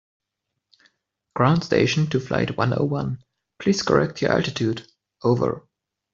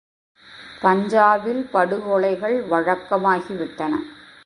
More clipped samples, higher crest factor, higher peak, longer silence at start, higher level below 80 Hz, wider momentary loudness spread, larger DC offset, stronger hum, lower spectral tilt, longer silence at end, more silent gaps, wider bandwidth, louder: neither; about the same, 20 dB vs 20 dB; about the same, -4 dBFS vs -2 dBFS; first, 1.35 s vs 0.5 s; first, -54 dBFS vs -62 dBFS; about the same, 10 LU vs 11 LU; neither; neither; about the same, -6 dB/octave vs -6.5 dB/octave; first, 0.55 s vs 0.3 s; neither; second, 7.6 kHz vs 11 kHz; about the same, -22 LUFS vs -20 LUFS